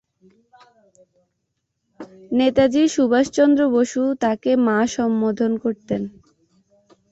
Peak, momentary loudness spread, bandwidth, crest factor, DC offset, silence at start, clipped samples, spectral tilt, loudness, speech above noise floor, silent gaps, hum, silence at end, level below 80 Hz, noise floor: -4 dBFS; 8 LU; 8 kHz; 18 dB; under 0.1%; 2 s; under 0.1%; -5 dB/octave; -19 LUFS; 55 dB; none; none; 1 s; -56 dBFS; -73 dBFS